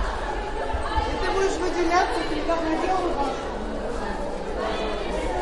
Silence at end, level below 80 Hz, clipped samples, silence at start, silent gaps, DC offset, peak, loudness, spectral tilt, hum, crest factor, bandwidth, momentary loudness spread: 0 s; -34 dBFS; under 0.1%; 0 s; none; under 0.1%; -8 dBFS; -26 LUFS; -5 dB/octave; none; 16 dB; 11.5 kHz; 8 LU